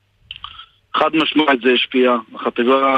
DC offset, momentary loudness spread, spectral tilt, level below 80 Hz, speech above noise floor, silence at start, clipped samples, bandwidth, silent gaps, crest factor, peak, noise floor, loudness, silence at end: under 0.1%; 19 LU; -5.5 dB/octave; -58 dBFS; 23 dB; 0.3 s; under 0.1%; 8.2 kHz; none; 16 dB; -2 dBFS; -38 dBFS; -16 LUFS; 0 s